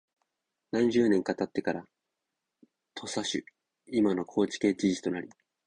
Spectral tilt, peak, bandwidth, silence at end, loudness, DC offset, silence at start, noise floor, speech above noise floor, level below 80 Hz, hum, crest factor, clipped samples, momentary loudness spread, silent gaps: -5 dB/octave; -12 dBFS; 10.5 kHz; 0.4 s; -30 LUFS; under 0.1%; 0.75 s; -86 dBFS; 57 dB; -66 dBFS; none; 18 dB; under 0.1%; 13 LU; none